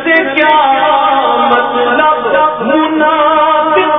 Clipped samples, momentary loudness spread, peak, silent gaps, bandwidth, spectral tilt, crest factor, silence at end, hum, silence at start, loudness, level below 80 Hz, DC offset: under 0.1%; 3 LU; 0 dBFS; none; 5.4 kHz; -7 dB/octave; 10 dB; 0 s; none; 0 s; -9 LUFS; -48 dBFS; 0.2%